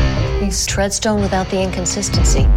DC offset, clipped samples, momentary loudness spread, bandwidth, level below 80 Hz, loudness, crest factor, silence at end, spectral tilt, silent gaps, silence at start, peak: under 0.1%; under 0.1%; 3 LU; 16 kHz; -20 dBFS; -17 LUFS; 12 dB; 0 s; -4.5 dB/octave; none; 0 s; -4 dBFS